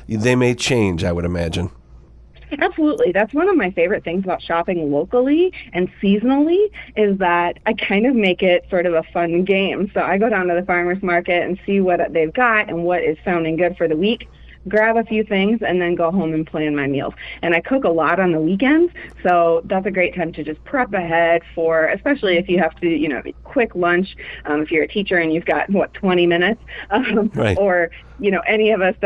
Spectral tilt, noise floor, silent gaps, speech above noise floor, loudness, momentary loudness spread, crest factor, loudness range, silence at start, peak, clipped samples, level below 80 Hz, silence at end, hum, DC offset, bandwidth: -6 dB/octave; -43 dBFS; none; 26 dB; -18 LUFS; 7 LU; 14 dB; 2 LU; 0 s; -2 dBFS; under 0.1%; -44 dBFS; 0 s; none; under 0.1%; 11 kHz